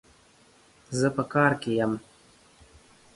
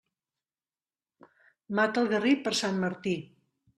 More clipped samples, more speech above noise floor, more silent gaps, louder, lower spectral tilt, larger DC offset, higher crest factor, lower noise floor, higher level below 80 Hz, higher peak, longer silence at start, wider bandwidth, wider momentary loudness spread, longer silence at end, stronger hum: neither; second, 34 dB vs over 62 dB; neither; about the same, -26 LUFS vs -28 LUFS; first, -6 dB/octave vs -4.5 dB/octave; neither; about the same, 22 dB vs 20 dB; second, -59 dBFS vs under -90 dBFS; first, -62 dBFS vs -74 dBFS; first, -8 dBFS vs -12 dBFS; second, 0.9 s vs 1.7 s; second, 11.5 kHz vs 13 kHz; about the same, 10 LU vs 8 LU; first, 1.15 s vs 0.55 s; neither